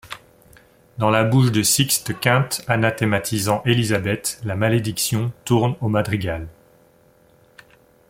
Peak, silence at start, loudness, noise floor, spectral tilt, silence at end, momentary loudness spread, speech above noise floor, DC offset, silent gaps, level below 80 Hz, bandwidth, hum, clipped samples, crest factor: 0 dBFS; 0.05 s; -20 LUFS; -55 dBFS; -4.5 dB/octave; 1.6 s; 9 LU; 35 dB; under 0.1%; none; -50 dBFS; 16.5 kHz; none; under 0.1%; 20 dB